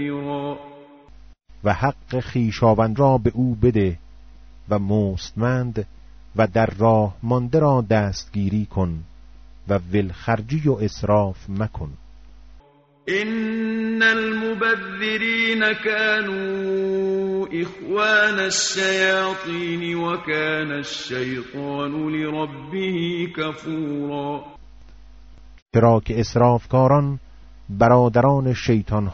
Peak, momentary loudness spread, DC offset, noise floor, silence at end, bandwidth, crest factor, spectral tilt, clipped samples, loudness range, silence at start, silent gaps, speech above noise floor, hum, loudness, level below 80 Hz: -4 dBFS; 11 LU; under 0.1%; -51 dBFS; 0 s; 8 kHz; 18 dB; -5 dB/octave; under 0.1%; 5 LU; 0 s; 25.62-25.66 s; 31 dB; none; -21 LUFS; -44 dBFS